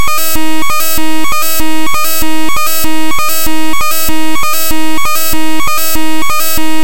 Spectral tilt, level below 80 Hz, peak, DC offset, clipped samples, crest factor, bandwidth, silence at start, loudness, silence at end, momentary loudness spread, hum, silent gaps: -2.5 dB/octave; -32 dBFS; 0 dBFS; 70%; 0.4%; 10 dB; 17.5 kHz; 0 s; -13 LUFS; 0 s; 2 LU; none; none